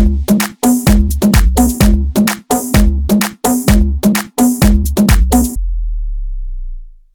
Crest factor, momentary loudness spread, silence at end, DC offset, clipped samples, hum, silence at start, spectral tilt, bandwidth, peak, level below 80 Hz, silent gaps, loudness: 12 dB; 14 LU; 0.25 s; under 0.1%; under 0.1%; none; 0 s; -5.5 dB/octave; over 20 kHz; 0 dBFS; -16 dBFS; none; -13 LUFS